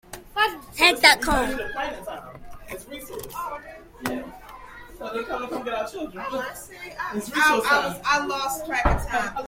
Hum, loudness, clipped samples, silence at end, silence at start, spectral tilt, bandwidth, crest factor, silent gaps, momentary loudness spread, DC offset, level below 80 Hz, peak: none; -23 LUFS; under 0.1%; 0 s; 0.1 s; -2.5 dB/octave; 16.5 kHz; 26 dB; none; 21 LU; under 0.1%; -38 dBFS; 0 dBFS